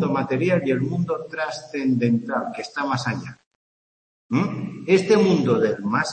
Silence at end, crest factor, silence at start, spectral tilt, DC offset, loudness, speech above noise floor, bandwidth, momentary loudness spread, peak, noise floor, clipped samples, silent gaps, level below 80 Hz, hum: 0 s; 18 dB; 0 s; -6.5 dB/octave; under 0.1%; -22 LUFS; over 68 dB; 8.8 kHz; 11 LU; -4 dBFS; under -90 dBFS; under 0.1%; 3.46-4.29 s; -64 dBFS; none